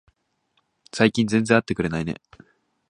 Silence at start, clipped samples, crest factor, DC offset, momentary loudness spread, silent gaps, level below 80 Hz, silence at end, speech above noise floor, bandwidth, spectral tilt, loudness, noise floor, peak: 0.95 s; under 0.1%; 24 dB; under 0.1%; 15 LU; none; -52 dBFS; 0.75 s; 49 dB; 11 kHz; -5.5 dB/octave; -22 LUFS; -70 dBFS; 0 dBFS